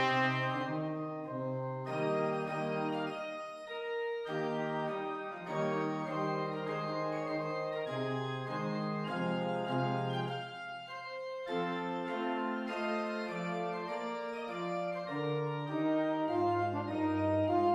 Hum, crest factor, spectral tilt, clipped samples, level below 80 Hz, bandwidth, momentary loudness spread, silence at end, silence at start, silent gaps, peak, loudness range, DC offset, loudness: none; 16 dB; -7 dB/octave; under 0.1%; -78 dBFS; 10.5 kHz; 8 LU; 0 s; 0 s; none; -20 dBFS; 2 LU; under 0.1%; -36 LUFS